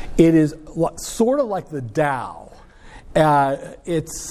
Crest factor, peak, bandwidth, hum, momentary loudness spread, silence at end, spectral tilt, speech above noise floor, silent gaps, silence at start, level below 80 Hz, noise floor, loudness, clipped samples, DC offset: 18 dB; -2 dBFS; 14.5 kHz; none; 12 LU; 0 s; -6 dB/octave; 22 dB; none; 0 s; -40 dBFS; -41 dBFS; -20 LUFS; under 0.1%; under 0.1%